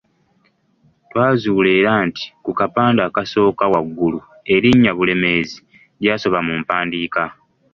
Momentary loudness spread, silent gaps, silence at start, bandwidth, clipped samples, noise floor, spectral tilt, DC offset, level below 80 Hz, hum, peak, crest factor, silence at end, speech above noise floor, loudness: 11 LU; none; 1.15 s; 7.2 kHz; under 0.1%; -60 dBFS; -7 dB/octave; under 0.1%; -50 dBFS; none; -2 dBFS; 16 dB; 0.4 s; 44 dB; -17 LUFS